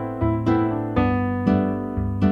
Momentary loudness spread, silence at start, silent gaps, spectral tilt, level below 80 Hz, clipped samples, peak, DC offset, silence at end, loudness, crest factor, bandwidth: 4 LU; 0 s; none; -10 dB/octave; -36 dBFS; under 0.1%; -6 dBFS; under 0.1%; 0 s; -22 LUFS; 16 dB; 6 kHz